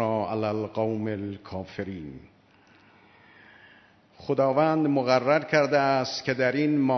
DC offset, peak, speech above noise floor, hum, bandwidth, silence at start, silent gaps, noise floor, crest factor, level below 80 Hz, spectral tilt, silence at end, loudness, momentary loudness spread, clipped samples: under 0.1%; -8 dBFS; 33 dB; none; 6.4 kHz; 0 s; none; -58 dBFS; 20 dB; -64 dBFS; -6.5 dB/octave; 0 s; -25 LUFS; 14 LU; under 0.1%